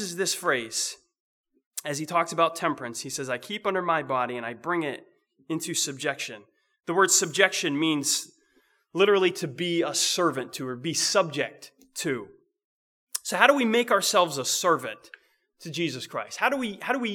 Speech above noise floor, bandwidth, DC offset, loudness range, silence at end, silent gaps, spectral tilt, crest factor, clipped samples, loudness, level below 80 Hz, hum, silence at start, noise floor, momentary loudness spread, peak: 40 dB; 20 kHz; under 0.1%; 5 LU; 0 s; 1.20-1.44 s, 1.66-1.71 s, 12.64-13.07 s; -2.5 dB/octave; 26 dB; under 0.1%; -25 LUFS; -80 dBFS; none; 0 s; -66 dBFS; 14 LU; -2 dBFS